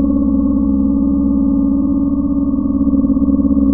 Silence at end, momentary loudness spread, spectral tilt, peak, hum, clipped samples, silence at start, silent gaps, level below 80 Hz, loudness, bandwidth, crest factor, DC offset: 0 s; 2 LU; -17 dB/octave; -4 dBFS; none; under 0.1%; 0 s; none; -26 dBFS; -14 LUFS; 1.4 kHz; 10 dB; under 0.1%